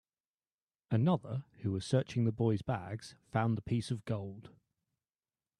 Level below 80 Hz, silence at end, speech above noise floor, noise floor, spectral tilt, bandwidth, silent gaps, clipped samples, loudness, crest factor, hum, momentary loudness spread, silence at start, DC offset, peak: -66 dBFS; 1.1 s; over 56 dB; under -90 dBFS; -7.5 dB/octave; 10.5 kHz; none; under 0.1%; -35 LUFS; 20 dB; none; 12 LU; 0.9 s; under 0.1%; -16 dBFS